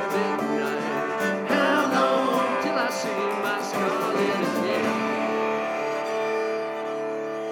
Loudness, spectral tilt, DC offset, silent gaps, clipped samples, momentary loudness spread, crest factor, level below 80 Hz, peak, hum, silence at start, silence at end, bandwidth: -25 LUFS; -4.5 dB/octave; under 0.1%; none; under 0.1%; 6 LU; 16 dB; -72 dBFS; -8 dBFS; none; 0 s; 0 s; 19 kHz